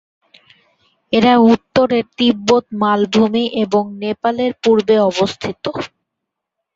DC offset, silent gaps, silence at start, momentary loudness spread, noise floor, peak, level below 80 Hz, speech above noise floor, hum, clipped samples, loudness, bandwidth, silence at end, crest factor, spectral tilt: under 0.1%; none; 1.1 s; 11 LU; -79 dBFS; 0 dBFS; -54 dBFS; 64 dB; none; under 0.1%; -15 LUFS; 7.8 kHz; 0.9 s; 16 dB; -5.5 dB/octave